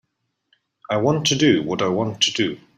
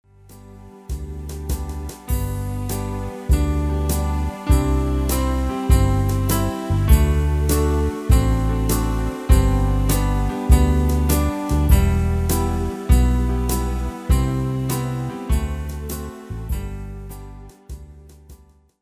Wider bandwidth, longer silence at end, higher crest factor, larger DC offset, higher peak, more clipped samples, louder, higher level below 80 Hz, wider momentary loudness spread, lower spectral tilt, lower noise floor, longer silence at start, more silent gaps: about the same, 15 kHz vs 16 kHz; second, 0.2 s vs 0.45 s; about the same, 18 dB vs 18 dB; neither; second, -4 dBFS vs 0 dBFS; neither; about the same, -19 LUFS vs -21 LUFS; second, -60 dBFS vs -22 dBFS; second, 6 LU vs 15 LU; second, -4 dB/octave vs -6.5 dB/octave; first, -75 dBFS vs -48 dBFS; first, 0.9 s vs 0.3 s; neither